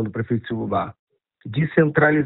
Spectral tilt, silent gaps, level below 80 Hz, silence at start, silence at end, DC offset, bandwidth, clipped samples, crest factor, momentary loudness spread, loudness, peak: -12 dB/octave; 0.99-1.07 s; -54 dBFS; 0 s; 0 s; under 0.1%; 4.1 kHz; under 0.1%; 18 dB; 14 LU; -21 LUFS; -2 dBFS